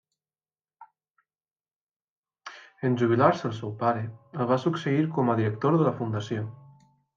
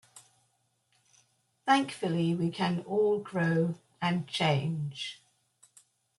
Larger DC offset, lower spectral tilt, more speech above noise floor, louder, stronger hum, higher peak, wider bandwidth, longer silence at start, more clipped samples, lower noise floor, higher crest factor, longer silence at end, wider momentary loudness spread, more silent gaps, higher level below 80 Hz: neither; first, -8 dB/octave vs -6 dB/octave; first, over 65 dB vs 45 dB; first, -26 LUFS vs -30 LUFS; neither; first, -8 dBFS vs -12 dBFS; second, 7.6 kHz vs 12 kHz; first, 0.8 s vs 0.15 s; neither; first, under -90 dBFS vs -74 dBFS; about the same, 20 dB vs 20 dB; second, 0.6 s vs 1.05 s; first, 16 LU vs 9 LU; first, 1.11-1.15 s, 1.76-1.87 s, 1.96-2.00 s, 2.09-2.23 s vs none; about the same, -70 dBFS vs -72 dBFS